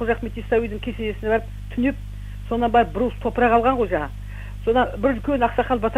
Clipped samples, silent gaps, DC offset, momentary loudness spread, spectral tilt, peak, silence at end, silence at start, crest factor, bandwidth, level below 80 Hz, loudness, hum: under 0.1%; none; under 0.1%; 13 LU; -7.5 dB/octave; -4 dBFS; 0 s; 0 s; 18 dB; 15 kHz; -34 dBFS; -22 LUFS; 50 Hz at -30 dBFS